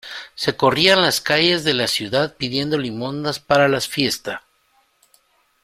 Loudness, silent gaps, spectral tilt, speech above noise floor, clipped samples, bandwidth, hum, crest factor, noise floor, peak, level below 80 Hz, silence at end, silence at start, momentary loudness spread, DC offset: -18 LUFS; none; -3.5 dB/octave; 43 dB; under 0.1%; 16 kHz; none; 20 dB; -62 dBFS; 0 dBFS; -56 dBFS; 1.25 s; 0.05 s; 12 LU; under 0.1%